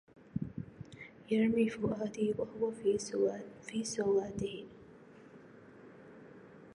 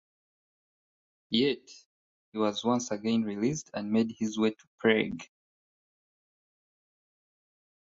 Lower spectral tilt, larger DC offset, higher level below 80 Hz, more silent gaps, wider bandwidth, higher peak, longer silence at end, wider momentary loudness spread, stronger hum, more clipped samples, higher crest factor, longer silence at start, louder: about the same, -5.5 dB/octave vs -4.5 dB/octave; neither; about the same, -66 dBFS vs -70 dBFS; second, none vs 1.86-2.32 s, 4.67-4.78 s; first, 11 kHz vs 7.8 kHz; second, -18 dBFS vs -10 dBFS; second, 0 s vs 2.7 s; first, 24 LU vs 9 LU; neither; neither; second, 18 dB vs 24 dB; second, 0.2 s vs 1.3 s; second, -35 LUFS vs -30 LUFS